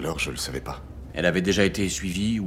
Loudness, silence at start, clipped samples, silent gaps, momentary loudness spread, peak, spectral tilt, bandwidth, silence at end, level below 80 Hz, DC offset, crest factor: -25 LUFS; 0 s; under 0.1%; none; 14 LU; -6 dBFS; -4.5 dB/octave; 16.5 kHz; 0 s; -40 dBFS; under 0.1%; 20 dB